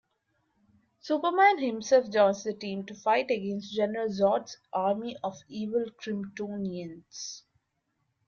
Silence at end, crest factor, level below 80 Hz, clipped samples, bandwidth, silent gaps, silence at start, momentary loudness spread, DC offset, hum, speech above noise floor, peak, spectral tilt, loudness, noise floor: 0.9 s; 20 dB; -74 dBFS; under 0.1%; 7.2 kHz; none; 1.05 s; 17 LU; under 0.1%; none; 50 dB; -10 dBFS; -5 dB/octave; -28 LUFS; -78 dBFS